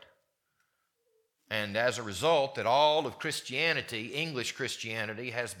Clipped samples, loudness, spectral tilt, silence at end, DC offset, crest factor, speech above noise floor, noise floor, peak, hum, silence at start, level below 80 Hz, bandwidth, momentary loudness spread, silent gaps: under 0.1%; -30 LUFS; -3 dB/octave; 0 s; under 0.1%; 20 dB; 47 dB; -78 dBFS; -12 dBFS; none; 1.5 s; -74 dBFS; 18.5 kHz; 9 LU; none